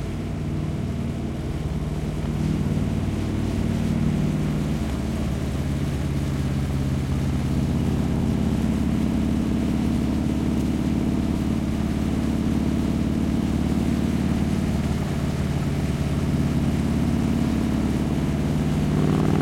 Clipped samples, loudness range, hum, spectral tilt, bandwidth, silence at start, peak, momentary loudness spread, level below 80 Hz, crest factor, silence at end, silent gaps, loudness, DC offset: under 0.1%; 2 LU; none; -7.5 dB/octave; 16.5 kHz; 0 s; -6 dBFS; 4 LU; -32 dBFS; 16 dB; 0 s; none; -24 LUFS; under 0.1%